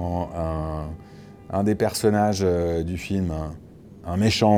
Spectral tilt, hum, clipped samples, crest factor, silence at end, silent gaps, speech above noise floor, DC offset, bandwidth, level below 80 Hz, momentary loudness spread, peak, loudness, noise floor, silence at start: -6 dB/octave; none; under 0.1%; 18 dB; 0 s; none; 22 dB; under 0.1%; 19.5 kHz; -40 dBFS; 19 LU; -6 dBFS; -24 LUFS; -44 dBFS; 0 s